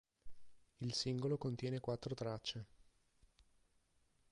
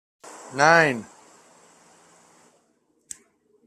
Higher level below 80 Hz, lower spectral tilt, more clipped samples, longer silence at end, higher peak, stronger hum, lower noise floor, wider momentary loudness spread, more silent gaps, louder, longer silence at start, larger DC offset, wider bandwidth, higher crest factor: about the same, -70 dBFS vs -70 dBFS; first, -5.5 dB/octave vs -4 dB/octave; neither; second, 0.9 s vs 2.65 s; second, -28 dBFS vs -2 dBFS; neither; first, -77 dBFS vs -67 dBFS; second, 8 LU vs 26 LU; neither; second, -43 LUFS vs -19 LUFS; about the same, 0.25 s vs 0.25 s; neither; second, 11 kHz vs 14.5 kHz; second, 18 dB vs 24 dB